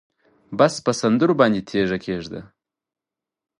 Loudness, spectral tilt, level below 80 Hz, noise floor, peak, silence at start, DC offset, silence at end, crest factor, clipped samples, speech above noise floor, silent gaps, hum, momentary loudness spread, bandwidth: -20 LUFS; -5.5 dB/octave; -56 dBFS; -88 dBFS; -2 dBFS; 0.5 s; under 0.1%; 1.15 s; 20 dB; under 0.1%; 68 dB; none; none; 15 LU; 11.5 kHz